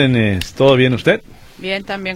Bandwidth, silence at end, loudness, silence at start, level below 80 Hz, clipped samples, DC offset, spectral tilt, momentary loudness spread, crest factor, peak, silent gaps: 15 kHz; 0 s; -15 LUFS; 0 s; -40 dBFS; under 0.1%; under 0.1%; -6.5 dB/octave; 11 LU; 16 dB; 0 dBFS; none